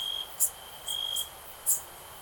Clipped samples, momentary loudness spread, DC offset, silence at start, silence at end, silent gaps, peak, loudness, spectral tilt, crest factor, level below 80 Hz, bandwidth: under 0.1%; 11 LU; under 0.1%; 0 s; 0 s; none; -10 dBFS; -30 LUFS; 2 dB/octave; 24 dB; -62 dBFS; 19.5 kHz